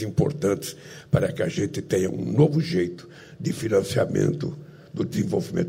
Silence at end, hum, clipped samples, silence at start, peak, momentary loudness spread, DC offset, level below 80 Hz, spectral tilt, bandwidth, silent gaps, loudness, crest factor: 0 s; none; under 0.1%; 0 s; -6 dBFS; 14 LU; under 0.1%; -54 dBFS; -6.5 dB/octave; 16 kHz; none; -25 LUFS; 18 dB